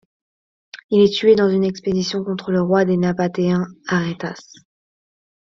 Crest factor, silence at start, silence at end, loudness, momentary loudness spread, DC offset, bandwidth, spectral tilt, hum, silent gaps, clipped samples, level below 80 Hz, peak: 16 dB; 0.75 s; 1 s; -18 LUFS; 10 LU; under 0.1%; 7.4 kHz; -6.5 dB/octave; none; 0.84-0.89 s; under 0.1%; -56 dBFS; -2 dBFS